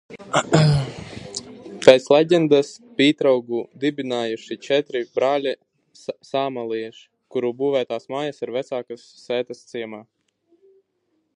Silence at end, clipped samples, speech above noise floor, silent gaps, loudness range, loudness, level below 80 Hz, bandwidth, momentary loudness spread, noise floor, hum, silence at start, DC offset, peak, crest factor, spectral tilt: 1.35 s; under 0.1%; 50 dB; none; 9 LU; -21 LUFS; -54 dBFS; 11 kHz; 18 LU; -70 dBFS; none; 0.1 s; under 0.1%; 0 dBFS; 22 dB; -5.5 dB/octave